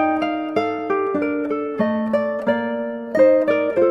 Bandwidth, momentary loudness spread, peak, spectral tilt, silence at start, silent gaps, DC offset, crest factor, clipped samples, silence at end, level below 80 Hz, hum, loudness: 7.2 kHz; 8 LU; -4 dBFS; -7.5 dB/octave; 0 s; none; under 0.1%; 16 dB; under 0.1%; 0 s; -64 dBFS; none; -20 LUFS